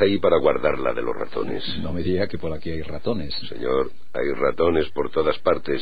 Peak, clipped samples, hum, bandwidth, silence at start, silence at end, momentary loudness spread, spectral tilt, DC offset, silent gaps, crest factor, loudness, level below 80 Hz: -4 dBFS; under 0.1%; none; 5 kHz; 0 s; 0 s; 10 LU; -8 dB/octave; 5%; none; 18 dB; -24 LUFS; -44 dBFS